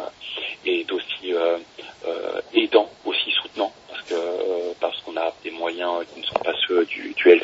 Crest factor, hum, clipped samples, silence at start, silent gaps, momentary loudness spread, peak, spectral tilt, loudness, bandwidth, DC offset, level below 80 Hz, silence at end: 22 dB; none; under 0.1%; 0 s; none; 10 LU; -2 dBFS; -3.5 dB/octave; -24 LUFS; 7.8 kHz; under 0.1%; -68 dBFS; 0 s